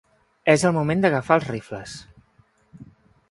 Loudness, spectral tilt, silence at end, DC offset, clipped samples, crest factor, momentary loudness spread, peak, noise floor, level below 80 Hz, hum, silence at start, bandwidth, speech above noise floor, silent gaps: -21 LUFS; -5.5 dB/octave; 0.5 s; under 0.1%; under 0.1%; 22 dB; 17 LU; -2 dBFS; -60 dBFS; -56 dBFS; none; 0.45 s; 11.5 kHz; 40 dB; none